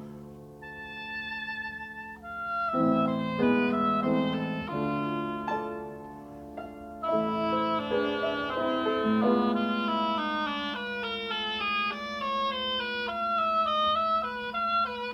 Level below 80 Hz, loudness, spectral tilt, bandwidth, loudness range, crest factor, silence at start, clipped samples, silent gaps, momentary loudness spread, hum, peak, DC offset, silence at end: -60 dBFS; -29 LUFS; -6.5 dB/octave; 10 kHz; 4 LU; 16 dB; 0 s; under 0.1%; none; 16 LU; none; -12 dBFS; under 0.1%; 0 s